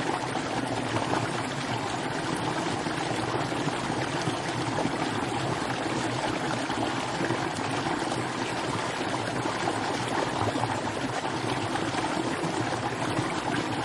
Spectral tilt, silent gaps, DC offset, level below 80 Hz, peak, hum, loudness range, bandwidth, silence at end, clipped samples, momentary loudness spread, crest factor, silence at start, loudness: -4.5 dB/octave; none; under 0.1%; -56 dBFS; -12 dBFS; none; 0 LU; 11.5 kHz; 0 s; under 0.1%; 2 LU; 18 dB; 0 s; -29 LUFS